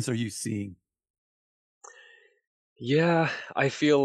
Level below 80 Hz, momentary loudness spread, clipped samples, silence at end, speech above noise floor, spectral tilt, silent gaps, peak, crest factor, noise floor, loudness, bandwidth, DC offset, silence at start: -72 dBFS; 13 LU; under 0.1%; 0 s; 31 dB; -5.5 dB/octave; 1.10-1.81 s, 2.47-2.76 s; -12 dBFS; 18 dB; -57 dBFS; -27 LUFS; 12.5 kHz; under 0.1%; 0 s